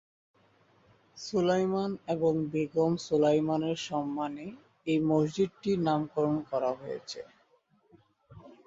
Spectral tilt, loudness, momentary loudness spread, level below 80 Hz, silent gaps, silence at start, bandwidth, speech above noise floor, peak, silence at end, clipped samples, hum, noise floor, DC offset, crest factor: -6.5 dB/octave; -30 LUFS; 14 LU; -68 dBFS; none; 1.15 s; 7.8 kHz; 39 dB; -14 dBFS; 0.15 s; under 0.1%; none; -68 dBFS; under 0.1%; 16 dB